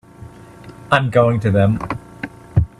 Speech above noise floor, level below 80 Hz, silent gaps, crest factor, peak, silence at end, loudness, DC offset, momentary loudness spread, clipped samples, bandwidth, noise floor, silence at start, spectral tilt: 24 dB; -38 dBFS; none; 18 dB; 0 dBFS; 0.15 s; -17 LUFS; under 0.1%; 15 LU; under 0.1%; 11 kHz; -39 dBFS; 0.2 s; -8 dB/octave